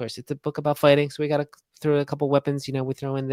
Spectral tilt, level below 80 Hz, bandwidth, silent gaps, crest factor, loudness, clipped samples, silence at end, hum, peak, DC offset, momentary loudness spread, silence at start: -6.5 dB/octave; -64 dBFS; 16 kHz; none; 20 dB; -24 LUFS; under 0.1%; 0 s; none; -4 dBFS; under 0.1%; 11 LU; 0 s